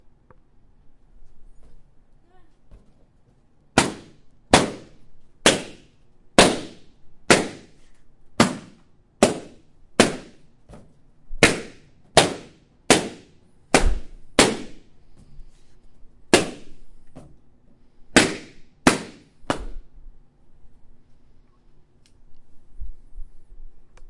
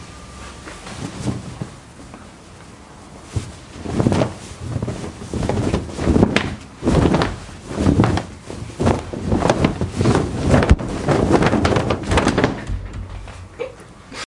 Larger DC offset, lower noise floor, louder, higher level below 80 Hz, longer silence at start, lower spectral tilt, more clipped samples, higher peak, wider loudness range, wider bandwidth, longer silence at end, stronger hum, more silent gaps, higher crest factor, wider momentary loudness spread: neither; first, -56 dBFS vs -40 dBFS; about the same, -20 LUFS vs -19 LUFS; second, -38 dBFS vs -32 dBFS; first, 0.85 s vs 0 s; second, -3 dB/octave vs -6.5 dB/octave; neither; about the same, 0 dBFS vs 0 dBFS; second, 7 LU vs 10 LU; about the same, 11.5 kHz vs 11.5 kHz; about the same, 0 s vs 0.05 s; neither; neither; first, 26 dB vs 20 dB; first, 24 LU vs 21 LU